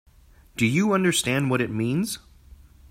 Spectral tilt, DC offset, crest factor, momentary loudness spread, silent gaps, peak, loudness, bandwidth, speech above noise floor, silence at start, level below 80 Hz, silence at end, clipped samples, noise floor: -4.5 dB/octave; under 0.1%; 18 dB; 10 LU; none; -8 dBFS; -23 LUFS; 16 kHz; 30 dB; 0.55 s; -54 dBFS; 0.35 s; under 0.1%; -53 dBFS